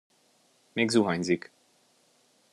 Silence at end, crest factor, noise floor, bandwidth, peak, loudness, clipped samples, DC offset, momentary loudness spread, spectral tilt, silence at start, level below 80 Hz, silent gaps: 1.15 s; 22 dB; -66 dBFS; 12 kHz; -10 dBFS; -27 LUFS; under 0.1%; under 0.1%; 12 LU; -5 dB/octave; 0.75 s; -72 dBFS; none